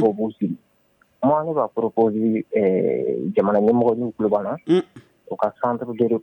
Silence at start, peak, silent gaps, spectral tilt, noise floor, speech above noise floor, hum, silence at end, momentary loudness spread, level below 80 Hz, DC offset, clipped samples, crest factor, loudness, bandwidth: 0 s; -6 dBFS; none; -9.5 dB/octave; -61 dBFS; 41 dB; none; 0 s; 8 LU; -64 dBFS; under 0.1%; under 0.1%; 14 dB; -21 LUFS; 8.6 kHz